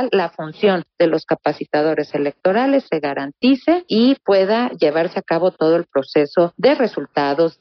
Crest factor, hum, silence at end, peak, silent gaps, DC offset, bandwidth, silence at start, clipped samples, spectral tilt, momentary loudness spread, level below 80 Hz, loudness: 14 dB; none; 0.1 s; -2 dBFS; none; under 0.1%; 6.2 kHz; 0 s; under 0.1%; -4 dB/octave; 5 LU; -66 dBFS; -18 LUFS